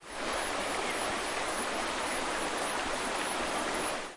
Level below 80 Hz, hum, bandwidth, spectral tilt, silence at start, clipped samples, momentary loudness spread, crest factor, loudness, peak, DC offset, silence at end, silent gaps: -54 dBFS; none; 11.5 kHz; -1.5 dB/octave; 0 s; under 0.1%; 1 LU; 14 dB; -32 LUFS; -20 dBFS; under 0.1%; 0 s; none